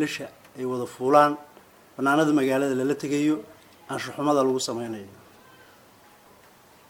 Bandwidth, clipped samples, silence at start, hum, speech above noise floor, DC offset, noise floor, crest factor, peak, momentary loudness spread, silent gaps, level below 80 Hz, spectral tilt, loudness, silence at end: 17 kHz; under 0.1%; 0 s; none; 30 dB; under 0.1%; -54 dBFS; 22 dB; -4 dBFS; 16 LU; none; -70 dBFS; -5 dB/octave; -24 LUFS; 1.8 s